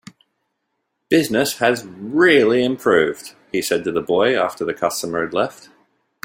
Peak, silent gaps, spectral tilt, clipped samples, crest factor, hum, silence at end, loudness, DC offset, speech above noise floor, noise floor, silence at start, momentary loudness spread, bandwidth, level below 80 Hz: -2 dBFS; none; -4 dB/octave; under 0.1%; 18 dB; none; 0.75 s; -18 LUFS; under 0.1%; 56 dB; -74 dBFS; 1.1 s; 10 LU; 16.5 kHz; -60 dBFS